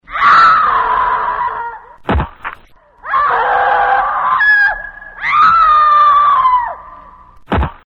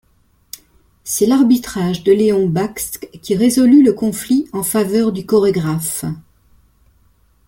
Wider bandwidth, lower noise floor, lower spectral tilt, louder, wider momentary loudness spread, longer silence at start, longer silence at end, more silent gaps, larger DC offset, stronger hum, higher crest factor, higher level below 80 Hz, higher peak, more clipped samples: second, 7.6 kHz vs 17 kHz; second, -43 dBFS vs -56 dBFS; about the same, -5.5 dB/octave vs -5.5 dB/octave; first, -11 LUFS vs -15 LUFS; about the same, 17 LU vs 19 LU; second, 0.1 s vs 1.05 s; second, 0.15 s vs 1.3 s; neither; neither; neither; about the same, 12 dB vs 14 dB; first, -30 dBFS vs -50 dBFS; about the same, 0 dBFS vs -2 dBFS; neither